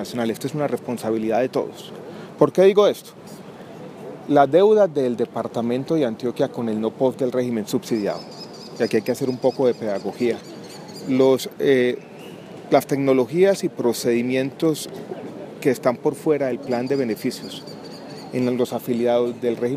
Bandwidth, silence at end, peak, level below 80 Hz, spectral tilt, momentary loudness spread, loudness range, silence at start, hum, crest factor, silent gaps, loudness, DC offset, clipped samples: 15.5 kHz; 0 s; -2 dBFS; -68 dBFS; -6 dB/octave; 19 LU; 4 LU; 0 s; none; 20 dB; none; -21 LUFS; under 0.1%; under 0.1%